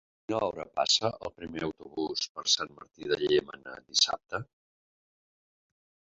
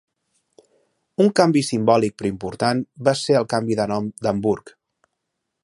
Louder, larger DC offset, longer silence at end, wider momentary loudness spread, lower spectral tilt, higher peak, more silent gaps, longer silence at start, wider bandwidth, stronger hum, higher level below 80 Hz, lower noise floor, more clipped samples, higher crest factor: second, -29 LUFS vs -20 LUFS; neither; first, 1.7 s vs 0.95 s; first, 15 LU vs 8 LU; second, -1.5 dB/octave vs -5.5 dB/octave; second, -10 dBFS vs -2 dBFS; first, 2.29-2.35 s vs none; second, 0.3 s vs 1.2 s; second, 7.6 kHz vs 11.5 kHz; neither; second, -64 dBFS vs -56 dBFS; first, under -90 dBFS vs -78 dBFS; neither; about the same, 22 dB vs 20 dB